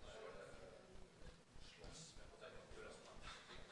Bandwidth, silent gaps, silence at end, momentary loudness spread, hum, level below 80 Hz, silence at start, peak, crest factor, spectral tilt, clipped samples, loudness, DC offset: 11 kHz; none; 0 s; 7 LU; none; -66 dBFS; 0 s; -42 dBFS; 16 dB; -3.5 dB/octave; under 0.1%; -59 LUFS; under 0.1%